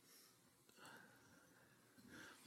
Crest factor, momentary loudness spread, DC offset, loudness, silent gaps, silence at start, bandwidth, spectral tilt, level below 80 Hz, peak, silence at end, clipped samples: 18 dB; 8 LU; under 0.1%; -65 LUFS; none; 0 s; 16 kHz; -2.5 dB/octave; under -90 dBFS; -48 dBFS; 0 s; under 0.1%